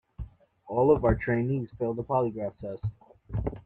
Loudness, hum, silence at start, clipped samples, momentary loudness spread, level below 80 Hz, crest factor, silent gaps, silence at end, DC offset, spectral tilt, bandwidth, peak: -28 LUFS; none; 0.2 s; under 0.1%; 15 LU; -42 dBFS; 18 dB; none; 0.05 s; under 0.1%; -11.5 dB/octave; 4.1 kHz; -10 dBFS